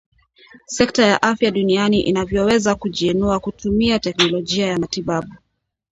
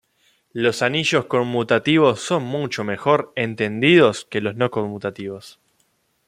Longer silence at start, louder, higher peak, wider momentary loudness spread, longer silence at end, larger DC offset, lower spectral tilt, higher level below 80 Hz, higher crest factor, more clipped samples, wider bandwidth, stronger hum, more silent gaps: first, 0.7 s vs 0.55 s; about the same, -18 LUFS vs -19 LUFS; about the same, 0 dBFS vs -2 dBFS; second, 7 LU vs 13 LU; second, 0.55 s vs 0.8 s; neither; about the same, -4.5 dB/octave vs -5 dB/octave; first, -42 dBFS vs -64 dBFS; about the same, 18 dB vs 18 dB; neither; second, 8.2 kHz vs 14.5 kHz; neither; neither